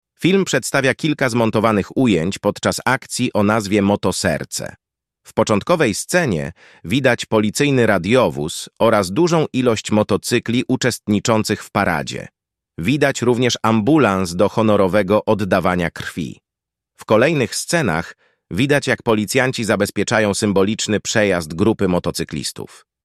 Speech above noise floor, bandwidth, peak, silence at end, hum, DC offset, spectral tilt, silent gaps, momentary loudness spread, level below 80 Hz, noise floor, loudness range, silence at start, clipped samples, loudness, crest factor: 68 dB; 14.5 kHz; -2 dBFS; 0.4 s; none; under 0.1%; -5 dB/octave; none; 9 LU; -48 dBFS; -85 dBFS; 3 LU; 0.2 s; under 0.1%; -17 LUFS; 16 dB